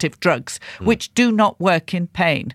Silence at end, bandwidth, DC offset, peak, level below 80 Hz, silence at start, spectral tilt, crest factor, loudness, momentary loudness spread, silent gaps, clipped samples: 0 s; 14.5 kHz; under 0.1%; -4 dBFS; -48 dBFS; 0 s; -5 dB/octave; 16 dB; -19 LUFS; 7 LU; none; under 0.1%